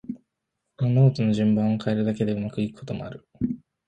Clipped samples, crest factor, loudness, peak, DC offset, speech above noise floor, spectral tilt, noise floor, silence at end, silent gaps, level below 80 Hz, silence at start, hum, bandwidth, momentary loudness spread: under 0.1%; 18 dB; -24 LUFS; -6 dBFS; under 0.1%; 57 dB; -9 dB/octave; -80 dBFS; 0.3 s; none; -56 dBFS; 0.1 s; none; 8.6 kHz; 15 LU